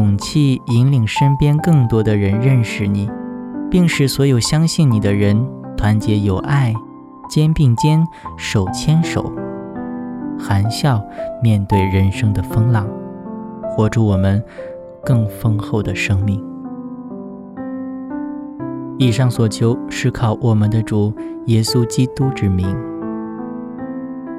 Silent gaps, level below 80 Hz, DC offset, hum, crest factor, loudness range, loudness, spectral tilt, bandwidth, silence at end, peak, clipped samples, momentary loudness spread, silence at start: none; -38 dBFS; under 0.1%; none; 16 dB; 5 LU; -17 LUFS; -6.5 dB/octave; 14 kHz; 0 s; -2 dBFS; under 0.1%; 13 LU; 0 s